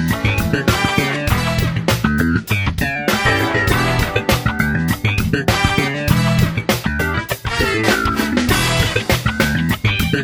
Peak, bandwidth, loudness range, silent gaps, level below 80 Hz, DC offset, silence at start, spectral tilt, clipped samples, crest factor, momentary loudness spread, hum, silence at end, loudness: 0 dBFS; 19 kHz; 1 LU; none; -28 dBFS; under 0.1%; 0 s; -5 dB/octave; under 0.1%; 16 dB; 3 LU; none; 0 s; -17 LUFS